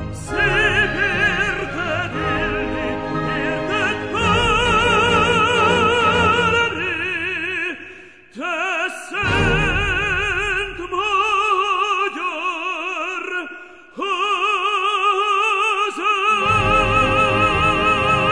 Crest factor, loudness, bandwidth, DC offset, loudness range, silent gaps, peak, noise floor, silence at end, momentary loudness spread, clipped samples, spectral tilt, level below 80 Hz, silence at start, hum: 14 dB; -18 LUFS; 11 kHz; 0.3%; 5 LU; none; -4 dBFS; -41 dBFS; 0 s; 9 LU; under 0.1%; -4.5 dB/octave; -36 dBFS; 0 s; none